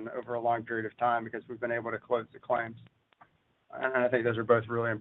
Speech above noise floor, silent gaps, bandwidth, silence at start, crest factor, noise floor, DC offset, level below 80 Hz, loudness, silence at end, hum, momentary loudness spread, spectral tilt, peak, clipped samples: 33 dB; none; 4.1 kHz; 0 s; 20 dB; -64 dBFS; under 0.1%; -74 dBFS; -31 LUFS; 0 s; none; 9 LU; -9.5 dB/octave; -10 dBFS; under 0.1%